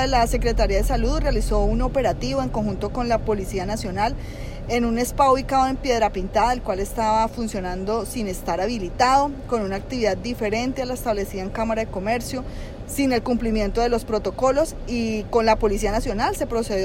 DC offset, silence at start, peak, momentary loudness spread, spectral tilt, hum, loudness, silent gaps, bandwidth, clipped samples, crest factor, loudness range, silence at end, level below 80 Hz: under 0.1%; 0 s; -6 dBFS; 7 LU; -5 dB/octave; none; -23 LUFS; none; 16.5 kHz; under 0.1%; 16 dB; 3 LU; 0 s; -30 dBFS